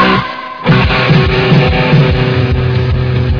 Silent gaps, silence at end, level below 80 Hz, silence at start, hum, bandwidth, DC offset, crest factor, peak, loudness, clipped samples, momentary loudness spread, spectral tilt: none; 0 s; -22 dBFS; 0 s; none; 5.4 kHz; under 0.1%; 10 dB; 0 dBFS; -10 LUFS; 0.2%; 4 LU; -8 dB/octave